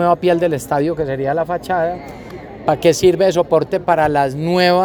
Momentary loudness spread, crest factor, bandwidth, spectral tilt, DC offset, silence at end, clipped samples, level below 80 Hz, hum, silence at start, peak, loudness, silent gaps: 10 LU; 16 dB; 19.5 kHz; -5.5 dB/octave; under 0.1%; 0 s; under 0.1%; -44 dBFS; none; 0 s; 0 dBFS; -16 LUFS; none